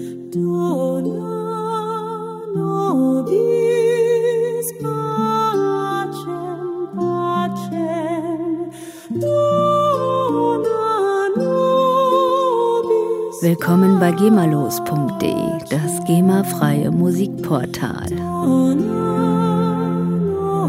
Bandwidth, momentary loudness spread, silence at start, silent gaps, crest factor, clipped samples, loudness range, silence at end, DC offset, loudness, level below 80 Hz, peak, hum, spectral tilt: 16 kHz; 9 LU; 0 s; none; 18 dB; under 0.1%; 5 LU; 0 s; under 0.1%; -18 LUFS; -54 dBFS; 0 dBFS; none; -7 dB/octave